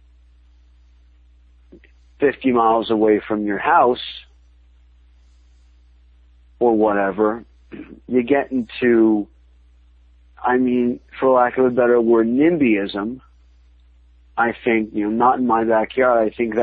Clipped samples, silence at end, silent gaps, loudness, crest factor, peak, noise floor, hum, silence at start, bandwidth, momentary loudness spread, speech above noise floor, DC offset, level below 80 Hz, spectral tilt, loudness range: under 0.1%; 0 s; none; -18 LUFS; 18 dB; -2 dBFS; -51 dBFS; 60 Hz at -45 dBFS; 2.2 s; 4.8 kHz; 11 LU; 33 dB; under 0.1%; -50 dBFS; -9 dB/octave; 6 LU